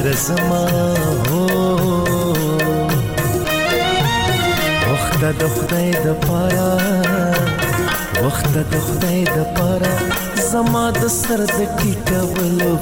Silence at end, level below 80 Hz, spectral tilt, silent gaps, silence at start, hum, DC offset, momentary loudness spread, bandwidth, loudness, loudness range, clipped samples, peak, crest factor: 0 s; -34 dBFS; -5 dB/octave; none; 0 s; none; under 0.1%; 2 LU; 17.5 kHz; -17 LUFS; 1 LU; under 0.1%; -6 dBFS; 10 dB